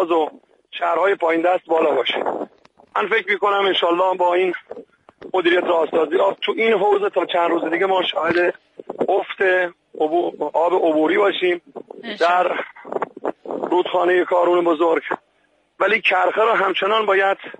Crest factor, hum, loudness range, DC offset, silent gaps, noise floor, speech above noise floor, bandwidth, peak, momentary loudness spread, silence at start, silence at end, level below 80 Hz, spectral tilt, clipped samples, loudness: 14 dB; none; 2 LU; under 0.1%; none; -62 dBFS; 44 dB; 8.8 kHz; -4 dBFS; 11 LU; 0 s; 0.05 s; -70 dBFS; -5 dB/octave; under 0.1%; -19 LUFS